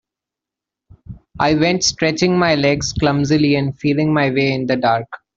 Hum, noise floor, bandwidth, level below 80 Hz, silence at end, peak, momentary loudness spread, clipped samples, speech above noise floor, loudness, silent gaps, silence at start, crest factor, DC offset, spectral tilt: none; -86 dBFS; 7.8 kHz; -42 dBFS; 0.2 s; -2 dBFS; 3 LU; under 0.1%; 70 dB; -16 LUFS; none; 1.1 s; 16 dB; under 0.1%; -5 dB/octave